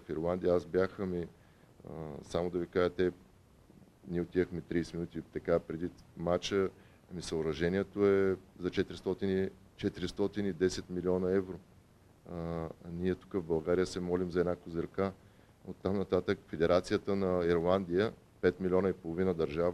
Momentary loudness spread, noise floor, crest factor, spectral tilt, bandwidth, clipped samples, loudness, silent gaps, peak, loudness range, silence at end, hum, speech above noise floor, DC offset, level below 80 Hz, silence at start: 11 LU; -61 dBFS; 20 dB; -6.5 dB/octave; 12.5 kHz; under 0.1%; -34 LUFS; none; -14 dBFS; 5 LU; 0 s; none; 28 dB; under 0.1%; -58 dBFS; 0 s